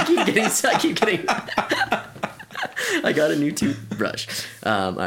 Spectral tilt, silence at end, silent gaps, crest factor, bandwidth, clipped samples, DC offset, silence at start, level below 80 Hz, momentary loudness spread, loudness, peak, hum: -3.5 dB/octave; 0 s; none; 18 dB; 17 kHz; under 0.1%; under 0.1%; 0 s; -58 dBFS; 10 LU; -22 LUFS; -4 dBFS; none